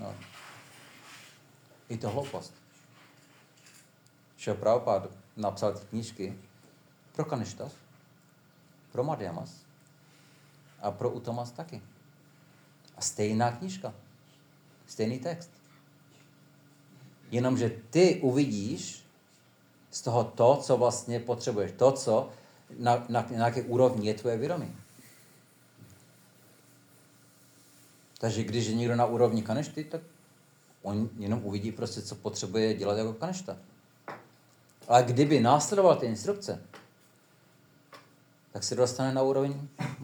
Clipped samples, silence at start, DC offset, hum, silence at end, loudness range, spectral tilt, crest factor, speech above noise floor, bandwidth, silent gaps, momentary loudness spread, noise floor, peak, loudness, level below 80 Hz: under 0.1%; 0 s; under 0.1%; none; 0 s; 13 LU; -5.5 dB/octave; 24 dB; 33 dB; over 20 kHz; none; 22 LU; -62 dBFS; -8 dBFS; -29 LUFS; -84 dBFS